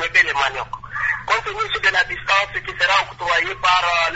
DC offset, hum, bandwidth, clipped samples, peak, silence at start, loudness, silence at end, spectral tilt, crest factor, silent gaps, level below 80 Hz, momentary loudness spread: under 0.1%; none; 8 kHz; under 0.1%; -2 dBFS; 0 s; -18 LUFS; 0 s; -1.5 dB/octave; 18 dB; none; -46 dBFS; 7 LU